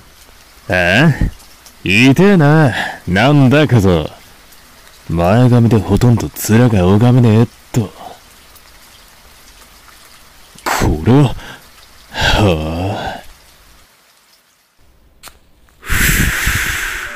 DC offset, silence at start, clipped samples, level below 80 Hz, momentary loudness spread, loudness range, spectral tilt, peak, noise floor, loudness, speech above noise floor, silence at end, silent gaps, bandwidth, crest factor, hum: under 0.1%; 0.7 s; under 0.1%; -28 dBFS; 16 LU; 11 LU; -6 dB/octave; -2 dBFS; -52 dBFS; -12 LUFS; 42 dB; 0 s; none; 16 kHz; 12 dB; none